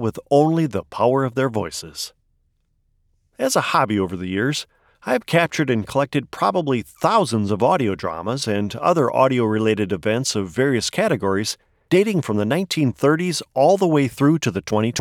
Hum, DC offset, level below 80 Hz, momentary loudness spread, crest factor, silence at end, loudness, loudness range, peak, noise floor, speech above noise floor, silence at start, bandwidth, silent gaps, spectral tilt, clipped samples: none; under 0.1%; -56 dBFS; 7 LU; 16 dB; 0 s; -20 LUFS; 4 LU; -4 dBFS; -66 dBFS; 46 dB; 0 s; 17.5 kHz; none; -5.5 dB/octave; under 0.1%